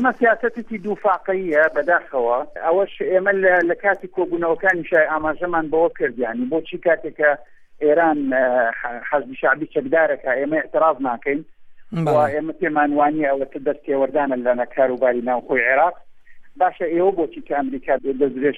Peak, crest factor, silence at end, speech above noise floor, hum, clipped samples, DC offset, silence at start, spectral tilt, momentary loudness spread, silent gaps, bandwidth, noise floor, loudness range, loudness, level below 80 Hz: -2 dBFS; 16 dB; 0 s; 20 dB; none; under 0.1%; under 0.1%; 0 s; -8 dB/octave; 7 LU; none; 7.6 kHz; -39 dBFS; 2 LU; -20 LUFS; -52 dBFS